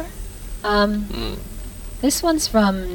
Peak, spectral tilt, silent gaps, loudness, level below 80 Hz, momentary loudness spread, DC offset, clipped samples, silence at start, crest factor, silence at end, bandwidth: -4 dBFS; -4 dB/octave; none; -20 LUFS; -32 dBFS; 17 LU; under 0.1%; under 0.1%; 0 s; 16 dB; 0 s; over 20 kHz